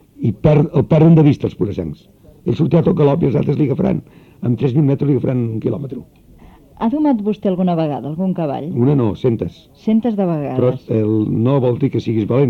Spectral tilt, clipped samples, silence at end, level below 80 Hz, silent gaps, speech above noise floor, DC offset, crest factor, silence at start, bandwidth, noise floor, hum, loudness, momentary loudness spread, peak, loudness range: -10.5 dB/octave; under 0.1%; 0 s; -44 dBFS; none; 28 dB; under 0.1%; 14 dB; 0.2 s; 6.2 kHz; -43 dBFS; none; -16 LUFS; 9 LU; -2 dBFS; 5 LU